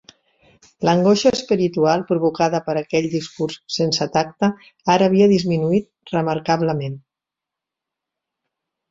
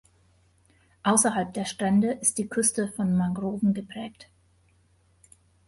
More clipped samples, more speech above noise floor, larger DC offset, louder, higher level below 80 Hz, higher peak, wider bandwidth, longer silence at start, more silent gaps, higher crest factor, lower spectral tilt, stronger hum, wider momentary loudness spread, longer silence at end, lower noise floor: neither; first, 68 dB vs 38 dB; neither; first, -19 LUFS vs -25 LUFS; about the same, -58 dBFS vs -62 dBFS; first, -2 dBFS vs -8 dBFS; second, 7.8 kHz vs 12 kHz; second, 0.8 s vs 1.05 s; neither; about the same, 18 dB vs 20 dB; first, -6 dB/octave vs -4.5 dB/octave; neither; about the same, 10 LU vs 10 LU; first, 1.9 s vs 1.45 s; first, -86 dBFS vs -63 dBFS